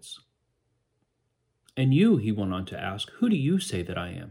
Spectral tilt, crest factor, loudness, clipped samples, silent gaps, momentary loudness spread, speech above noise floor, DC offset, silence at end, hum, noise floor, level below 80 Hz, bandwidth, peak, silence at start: -6.5 dB/octave; 16 dB; -26 LUFS; under 0.1%; none; 15 LU; 50 dB; under 0.1%; 0 s; none; -76 dBFS; -60 dBFS; 16 kHz; -10 dBFS; 0.05 s